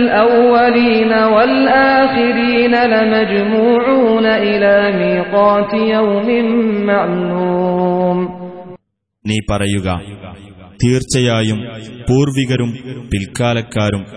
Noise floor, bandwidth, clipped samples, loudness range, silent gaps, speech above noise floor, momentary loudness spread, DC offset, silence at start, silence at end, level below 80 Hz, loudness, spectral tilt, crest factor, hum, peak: -47 dBFS; 11 kHz; under 0.1%; 7 LU; none; 34 dB; 11 LU; 0.2%; 0 s; 0 s; -40 dBFS; -13 LUFS; -6 dB/octave; 12 dB; none; 0 dBFS